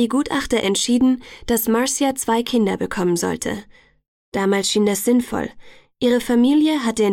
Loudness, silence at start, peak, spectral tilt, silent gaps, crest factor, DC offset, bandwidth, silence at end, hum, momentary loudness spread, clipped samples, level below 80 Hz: -19 LUFS; 0 s; -6 dBFS; -4 dB/octave; 4.08-4.32 s; 12 dB; under 0.1%; 17.5 kHz; 0 s; none; 9 LU; under 0.1%; -46 dBFS